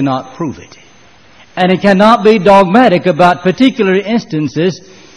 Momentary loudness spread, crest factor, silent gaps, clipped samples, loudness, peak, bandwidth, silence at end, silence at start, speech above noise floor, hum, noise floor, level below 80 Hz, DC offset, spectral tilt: 15 LU; 10 dB; none; 0.6%; -10 LUFS; 0 dBFS; 11 kHz; 0.4 s; 0 s; 33 dB; none; -43 dBFS; -46 dBFS; 0.5%; -6.5 dB/octave